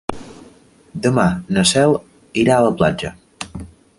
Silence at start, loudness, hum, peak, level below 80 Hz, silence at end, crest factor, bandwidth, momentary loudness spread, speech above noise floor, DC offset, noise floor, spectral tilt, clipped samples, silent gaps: 0.1 s; -16 LUFS; none; 0 dBFS; -44 dBFS; 0.35 s; 18 dB; 11.5 kHz; 19 LU; 32 dB; under 0.1%; -48 dBFS; -5 dB/octave; under 0.1%; none